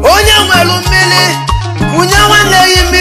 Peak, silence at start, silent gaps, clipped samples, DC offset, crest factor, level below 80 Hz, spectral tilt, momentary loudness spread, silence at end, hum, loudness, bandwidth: 0 dBFS; 0 s; none; 1%; under 0.1%; 8 dB; -18 dBFS; -3 dB/octave; 8 LU; 0 s; none; -6 LUFS; over 20 kHz